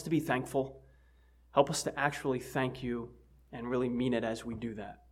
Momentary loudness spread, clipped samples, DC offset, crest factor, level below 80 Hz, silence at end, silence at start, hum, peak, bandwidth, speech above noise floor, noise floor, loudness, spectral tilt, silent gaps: 11 LU; under 0.1%; under 0.1%; 26 dB; -60 dBFS; 0.15 s; 0 s; none; -10 dBFS; 16.5 kHz; 29 dB; -63 dBFS; -34 LUFS; -5 dB/octave; none